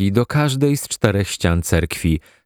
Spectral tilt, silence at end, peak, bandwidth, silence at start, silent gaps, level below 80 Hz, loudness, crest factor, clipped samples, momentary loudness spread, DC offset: -5.5 dB/octave; 0.25 s; 0 dBFS; 19.5 kHz; 0 s; none; -32 dBFS; -19 LUFS; 18 dB; under 0.1%; 3 LU; under 0.1%